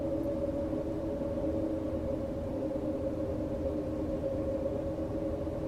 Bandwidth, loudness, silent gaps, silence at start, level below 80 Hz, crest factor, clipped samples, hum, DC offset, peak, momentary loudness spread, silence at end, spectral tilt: 13.5 kHz; -34 LUFS; none; 0 s; -46 dBFS; 12 dB; under 0.1%; none; under 0.1%; -20 dBFS; 2 LU; 0 s; -9 dB/octave